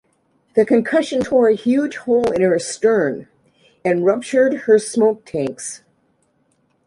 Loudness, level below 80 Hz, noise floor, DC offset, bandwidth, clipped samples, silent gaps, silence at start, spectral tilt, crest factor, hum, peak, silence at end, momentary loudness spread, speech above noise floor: -17 LUFS; -58 dBFS; -63 dBFS; under 0.1%; 11.5 kHz; under 0.1%; none; 0.55 s; -5 dB/octave; 16 dB; none; -2 dBFS; 1.1 s; 10 LU; 46 dB